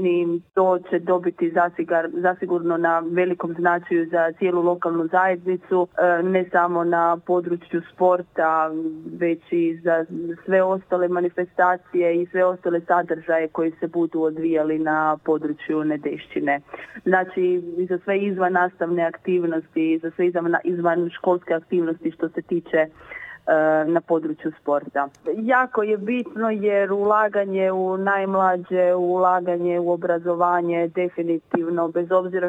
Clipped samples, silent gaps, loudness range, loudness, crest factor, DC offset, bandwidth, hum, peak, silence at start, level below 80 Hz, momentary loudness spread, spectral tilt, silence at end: under 0.1%; none; 2 LU; -22 LUFS; 18 dB; under 0.1%; 3.8 kHz; none; -4 dBFS; 0 s; -70 dBFS; 6 LU; -9 dB/octave; 0 s